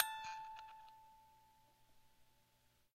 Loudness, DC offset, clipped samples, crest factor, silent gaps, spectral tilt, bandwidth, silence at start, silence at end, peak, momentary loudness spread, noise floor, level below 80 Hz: -47 LUFS; under 0.1%; under 0.1%; 34 dB; none; 0.5 dB/octave; 16 kHz; 0 s; 0.65 s; -16 dBFS; 22 LU; -76 dBFS; -80 dBFS